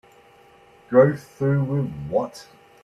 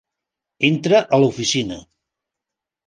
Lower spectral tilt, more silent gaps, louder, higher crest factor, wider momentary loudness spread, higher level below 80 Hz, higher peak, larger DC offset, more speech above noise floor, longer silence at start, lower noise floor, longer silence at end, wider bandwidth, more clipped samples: first, -8.5 dB/octave vs -4.5 dB/octave; neither; second, -22 LUFS vs -17 LUFS; about the same, 20 dB vs 18 dB; about the same, 11 LU vs 12 LU; about the same, -56 dBFS vs -56 dBFS; about the same, -2 dBFS vs -2 dBFS; neither; second, 31 dB vs 68 dB; first, 0.9 s vs 0.6 s; second, -52 dBFS vs -85 dBFS; second, 0.4 s vs 1.1 s; first, 12.5 kHz vs 10 kHz; neither